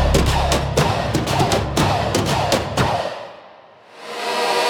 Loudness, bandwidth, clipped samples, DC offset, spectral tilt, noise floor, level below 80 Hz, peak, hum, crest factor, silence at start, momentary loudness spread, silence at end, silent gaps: -19 LUFS; 17.5 kHz; under 0.1%; under 0.1%; -4.5 dB/octave; -45 dBFS; -28 dBFS; -2 dBFS; none; 18 dB; 0 s; 11 LU; 0 s; none